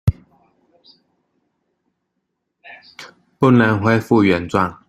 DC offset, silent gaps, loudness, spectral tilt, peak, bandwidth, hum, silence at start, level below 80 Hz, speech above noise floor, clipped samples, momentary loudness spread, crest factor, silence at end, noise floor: under 0.1%; none; -16 LUFS; -8 dB/octave; -2 dBFS; 14 kHz; none; 0.05 s; -42 dBFS; 59 dB; under 0.1%; 25 LU; 18 dB; 0.15 s; -75 dBFS